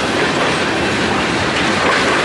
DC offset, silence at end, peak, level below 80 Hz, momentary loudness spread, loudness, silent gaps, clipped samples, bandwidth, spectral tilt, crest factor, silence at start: under 0.1%; 0 s; -2 dBFS; -42 dBFS; 2 LU; -15 LUFS; none; under 0.1%; 11.5 kHz; -3.5 dB/octave; 12 dB; 0 s